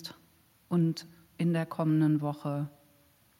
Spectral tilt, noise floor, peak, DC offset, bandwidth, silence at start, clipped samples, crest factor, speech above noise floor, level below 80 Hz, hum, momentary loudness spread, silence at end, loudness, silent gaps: -8 dB/octave; -64 dBFS; -16 dBFS; under 0.1%; 15.5 kHz; 0 s; under 0.1%; 14 dB; 36 dB; -76 dBFS; none; 14 LU; 0.7 s; -31 LUFS; none